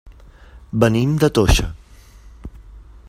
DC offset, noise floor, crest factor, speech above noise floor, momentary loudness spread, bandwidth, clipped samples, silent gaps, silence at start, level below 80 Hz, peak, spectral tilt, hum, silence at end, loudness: under 0.1%; -44 dBFS; 20 dB; 28 dB; 24 LU; 16 kHz; under 0.1%; none; 0.05 s; -28 dBFS; 0 dBFS; -5.5 dB/octave; none; 0.3 s; -17 LUFS